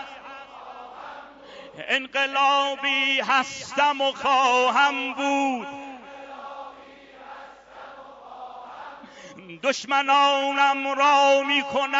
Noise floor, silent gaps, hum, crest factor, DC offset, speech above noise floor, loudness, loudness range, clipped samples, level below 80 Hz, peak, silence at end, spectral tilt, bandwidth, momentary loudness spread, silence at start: -46 dBFS; none; none; 18 dB; under 0.1%; 25 dB; -21 LUFS; 20 LU; under 0.1%; -70 dBFS; -8 dBFS; 0 s; -1.5 dB/octave; 7.8 kHz; 24 LU; 0 s